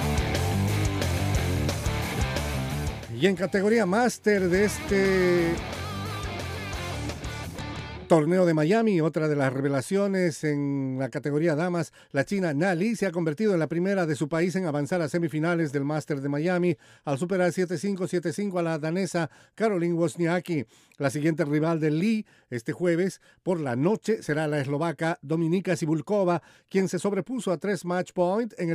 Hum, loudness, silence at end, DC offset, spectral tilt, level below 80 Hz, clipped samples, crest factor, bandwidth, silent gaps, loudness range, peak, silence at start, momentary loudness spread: none; -26 LUFS; 0 s; under 0.1%; -6 dB/octave; -44 dBFS; under 0.1%; 18 dB; 15.5 kHz; none; 3 LU; -8 dBFS; 0 s; 10 LU